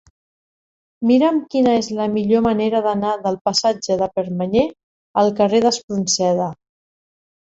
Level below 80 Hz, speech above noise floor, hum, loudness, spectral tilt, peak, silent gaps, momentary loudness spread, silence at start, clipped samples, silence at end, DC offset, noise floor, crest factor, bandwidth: -54 dBFS; over 73 dB; none; -18 LUFS; -4.5 dB/octave; -4 dBFS; 3.41-3.45 s, 4.83-5.14 s, 5.84-5.88 s; 6 LU; 1 s; under 0.1%; 1.05 s; under 0.1%; under -90 dBFS; 16 dB; 8.2 kHz